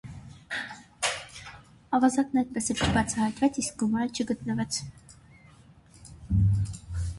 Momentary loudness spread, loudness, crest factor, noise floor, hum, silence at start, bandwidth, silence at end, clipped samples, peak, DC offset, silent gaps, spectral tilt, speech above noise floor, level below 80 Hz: 19 LU; -28 LUFS; 18 dB; -54 dBFS; none; 0.05 s; 11.5 kHz; 0 s; under 0.1%; -12 dBFS; under 0.1%; none; -5 dB/octave; 27 dB; -42 dBFS